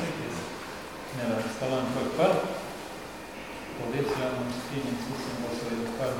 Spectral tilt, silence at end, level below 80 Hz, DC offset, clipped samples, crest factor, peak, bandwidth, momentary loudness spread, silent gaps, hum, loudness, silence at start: -5 dB/octave; 0 s; -56 dBFS; 0.1%; under 0.1%; 20 dB; -12 dBFS; 18 kHz; 13 LU; none; none; -32 LUFS; 0 s